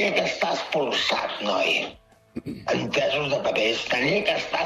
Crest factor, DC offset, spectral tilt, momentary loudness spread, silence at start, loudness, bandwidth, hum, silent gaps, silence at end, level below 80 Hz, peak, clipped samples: 18 dB; under 0.1%; -3.5 dB/octave; 11 LU; 0 s; -24 LUFS; 13.5 kHz; none; none; 0 s; -60 dBFS; -6 dBFS; under 0.1%